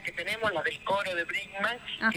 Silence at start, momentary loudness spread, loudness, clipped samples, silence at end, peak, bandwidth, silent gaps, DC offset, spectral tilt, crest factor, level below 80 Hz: 0 s; 3 LU; -30 LUFS; under 0.1%; 0 s; -14 dBFS; 19.5 kHz; none; under 0.1%; -3.5 dB/octave; 18 dB; -64 dBFS